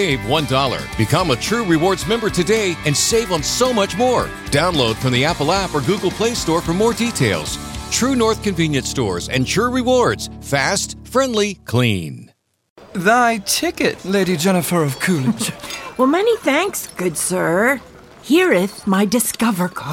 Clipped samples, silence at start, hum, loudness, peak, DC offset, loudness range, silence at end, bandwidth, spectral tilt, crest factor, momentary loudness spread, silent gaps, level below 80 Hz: under 0.1%; 0 s; none; -17 LUFS; -2 dBFS; under 0.1%; 2 LU; 0 s; 16.5 kHz; -4 dB/octave; 16 dB; 6 LU; 12.70-12.76 s; -40 dBFS